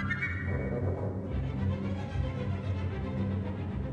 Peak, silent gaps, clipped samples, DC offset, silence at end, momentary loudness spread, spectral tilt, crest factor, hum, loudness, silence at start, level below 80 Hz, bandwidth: -20 dBFS; none; under 0.1%; under 0.1%; 0 s; 3 LU; -8.5 dB/octave; 12 dB; none; -34 LUFS; 0 s; -42 dBFS; 6.8 kHz